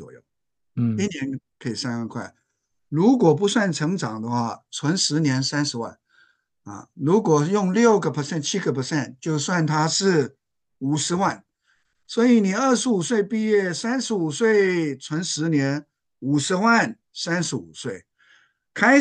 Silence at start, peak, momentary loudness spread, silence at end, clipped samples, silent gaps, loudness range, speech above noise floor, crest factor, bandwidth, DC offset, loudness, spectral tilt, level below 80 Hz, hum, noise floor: 0 s; -4 dBFS; 14 LU; 0 s; under 0.1%; none; 3 LU; 59 dB; 18 dB; 10 kHz; under 0.1%; -22 LUFS; -5 dB/octave; -68 dBFS; none; -81 dBFS